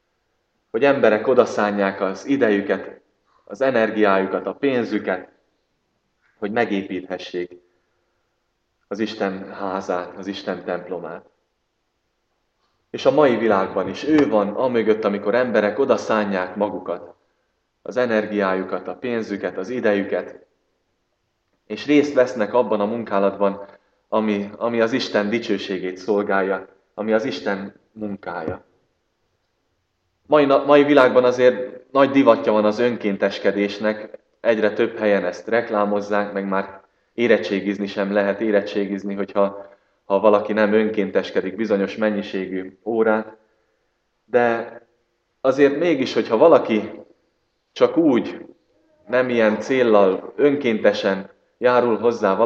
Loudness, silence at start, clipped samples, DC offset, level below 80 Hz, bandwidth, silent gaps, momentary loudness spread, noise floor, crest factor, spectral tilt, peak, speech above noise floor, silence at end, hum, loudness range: -20 LUFS; 0.75 s; under 0.1%; under 0.1%; -68 dBFS; 7.4 kHz; none; 13 LU; -72 dBFS; 20 dB; -6.5 dB/octave; 0 dBFS; 53 dB; 0 s; none; 10 LU